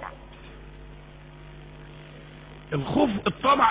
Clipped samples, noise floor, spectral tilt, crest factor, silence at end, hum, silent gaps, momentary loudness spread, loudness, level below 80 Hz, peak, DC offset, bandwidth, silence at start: under 0.1%; -45 dBFS; -4 dB/octave; 22 dB; 0 s; none; none; 23 LU; -24 LUFS; -48 dBFS; -6 dBFS; under 0.1%; 4 kHz; 0 s